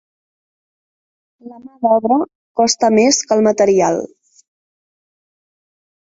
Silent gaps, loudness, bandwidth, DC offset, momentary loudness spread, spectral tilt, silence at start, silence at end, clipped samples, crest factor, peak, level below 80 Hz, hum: 2.35-2.55 s; -14 LUFS; 8 kHz; under 0.1%; 10 LU; -3.5 dB/octave; 1.45 s; 1.95 s; under 0.1%; 16 dB; -2 dBFS; -60 dBFS; none